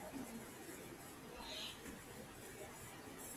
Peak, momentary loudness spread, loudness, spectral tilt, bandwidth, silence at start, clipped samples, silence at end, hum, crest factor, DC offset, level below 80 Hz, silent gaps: -36 dBFS; 6 LU; -51 LUFS; -3 dB/octave; 16 kHz; 0 s; under 0.1%; 0 s; none; 16 dB; under 0.1%; -68 dBFS; none